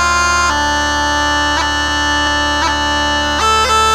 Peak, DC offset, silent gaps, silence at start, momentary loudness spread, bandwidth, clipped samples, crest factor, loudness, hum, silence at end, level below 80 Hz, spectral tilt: -2 dBFS; under 0.1%; none; 0 s; 2 LU; 16 kHz; under 0.1%; 12 dB; -13 LUFS; none; 0 s; -28 dBFS; -2 dB/octave